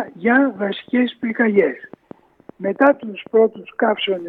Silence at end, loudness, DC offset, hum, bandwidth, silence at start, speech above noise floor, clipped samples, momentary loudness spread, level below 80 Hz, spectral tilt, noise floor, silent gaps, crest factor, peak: 0 s; -18 LUFS; under 0.1%; none; 4.4 kHz; 0 s; 27 dB; under 0.1%; 9 LU; -70 dBFS; -8 dB/octave; -45 dBFS; none; 16 dB; -4 dBFS